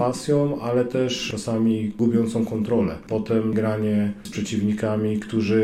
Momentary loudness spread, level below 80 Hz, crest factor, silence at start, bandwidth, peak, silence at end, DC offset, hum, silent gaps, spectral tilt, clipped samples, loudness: 4 LU; -52 dBFS; 12 dB; 0 s; 13.5 kHz; -10 dBFS; 0 s; under 0.1%; none; none; -6.5 dB/octave; under 0.1%; -23 LUFS